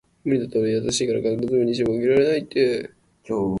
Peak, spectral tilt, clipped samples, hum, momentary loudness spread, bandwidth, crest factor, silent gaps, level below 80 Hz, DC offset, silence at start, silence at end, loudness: -6 dBFS; -5 dB/octave; under 0.1%; none; 7 LU; 11.5 kHz; 14 dB; none; -54 dBFS; under 0.1%; 0.25 s; 0 s; -22 LUFS